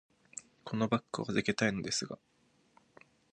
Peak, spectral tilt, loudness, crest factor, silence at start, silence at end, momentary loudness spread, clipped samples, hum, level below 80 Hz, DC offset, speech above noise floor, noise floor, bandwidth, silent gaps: -14 dBFS; -4.5 dB/octave; -34 LUFS; 24 dB; 0.35 s; 1.2 s; 17 LU; under 0.1%; none; -68 dBFS; under 0.1%; 34 dB; -68 dBFS; 10.5 kHz; none